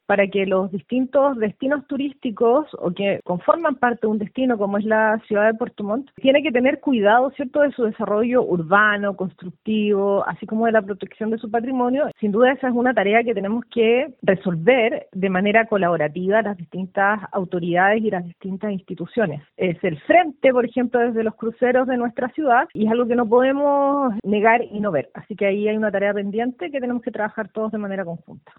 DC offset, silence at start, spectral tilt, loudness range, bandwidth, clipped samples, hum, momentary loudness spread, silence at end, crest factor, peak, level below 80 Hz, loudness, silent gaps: under 0.1%; 0.1 s; -10.5 dB/octave; 3 LU; 4.1 kHz; under 0.1%; none; 9 LU; 0.25 s; 18 dB; -2 dBFS; -62 dBFS; -20 LUFS; none